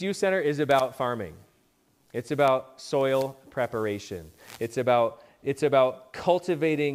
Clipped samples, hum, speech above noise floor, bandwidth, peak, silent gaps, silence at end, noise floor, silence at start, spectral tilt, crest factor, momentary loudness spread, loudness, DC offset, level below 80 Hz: under 0.1%; none; 40 dB; 16 kHz; -8 dBFS; none; 0 s; -66 dBFS; 0 s; -5.5 dB/octave; 18 dB; 12 LU; -26 LUFS; under 0.1%; -64 dBFS